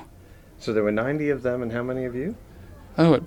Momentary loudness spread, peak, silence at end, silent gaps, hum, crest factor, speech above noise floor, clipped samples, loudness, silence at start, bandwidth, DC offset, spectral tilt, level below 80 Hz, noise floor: 17 LU; -6 dBFS; 0 s; none; none; 20 dB; 25 dB; under 0.1%; -26 LUFS; 0 s; 11.5 kHz; under 0.1%; -8 dB/octave; -50 dBFS; -48 dBFS